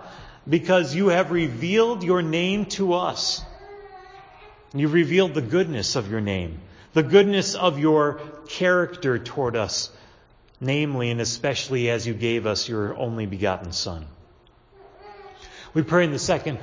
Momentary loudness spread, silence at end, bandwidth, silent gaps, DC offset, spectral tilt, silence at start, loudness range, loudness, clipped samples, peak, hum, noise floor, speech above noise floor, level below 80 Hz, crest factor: 15 LU; 0 s; 7.6 kHz; none; under 0.1%; -5 dB/octave; 0 s; 6 LU; -23 LUFS; under 0.1%; -2 dBFS; none; -55 dBFS; 33 dB; -50 dBFS; 22 dB